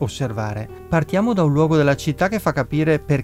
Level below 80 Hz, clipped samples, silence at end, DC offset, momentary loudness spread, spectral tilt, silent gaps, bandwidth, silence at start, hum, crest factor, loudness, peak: -42 dBFS; under 0.1%; 0 s; under 0.1%; 9 LU; -7 dB/octave; none; 15.5 kHz; 0 s; none; 14 dB; -19 LUFS; -4 dBFS